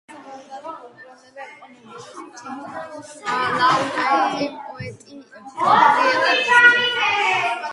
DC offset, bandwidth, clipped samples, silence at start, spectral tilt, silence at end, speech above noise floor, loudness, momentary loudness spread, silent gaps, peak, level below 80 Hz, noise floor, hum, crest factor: under 0.1%; 11.5 kHz; under 0.1%; 0.1 s; -2.5 dB/octave; 0 s; 26 dB; -17 LUFS; 25 LU; none; 0 dBFS; -66 dBFS; -45 dBFS; none; 20 dB